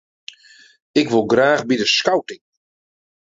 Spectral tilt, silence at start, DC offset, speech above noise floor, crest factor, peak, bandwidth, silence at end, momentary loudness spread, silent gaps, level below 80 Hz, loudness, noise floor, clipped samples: -4 dB/octave; 0.95 s; under 0.1%; 32 dB; 18 dB; -2 dBFS; 7.8 kHz; 0.9 s; 11 LU; none; -62 dBFS; -17 LUFS; -49 dBFS; under 0.1%